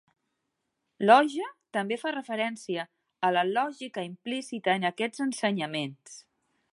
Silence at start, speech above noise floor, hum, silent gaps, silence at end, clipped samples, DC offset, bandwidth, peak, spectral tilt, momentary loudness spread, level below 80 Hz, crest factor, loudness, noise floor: 1 s; 53 dB; none; none; 0.5 s; under 0.1%; under 0.1%; 11.5 kHz; -6 dBFS; -4.5 dB/octave; 16 LU; -84 dBFS; 24 dB; -28 LUFS; -81 dBFS